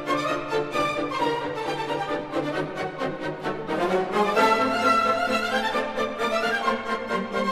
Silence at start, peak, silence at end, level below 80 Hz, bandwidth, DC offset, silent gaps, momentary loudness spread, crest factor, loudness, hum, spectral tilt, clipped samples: 0 s; -8 dBFS; 0 s; -56 dBFS; 15 kHz; under 0.1%; none; 9 LU; 16 dB; -25 LUFS; none; -4.5 dB/octave; under 0.1%